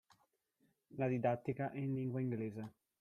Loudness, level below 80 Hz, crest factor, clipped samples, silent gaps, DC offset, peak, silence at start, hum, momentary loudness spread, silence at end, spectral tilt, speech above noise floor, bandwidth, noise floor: -40 LUFS; -78 dBFS; 18 dB; under 0.1%; none; under 0.1%; -22 dBFS; 0.95 s; none; 14 LU; 0.3 s; -10 dB/octave; 41 dB; 6.6 kHz; -80 dBFS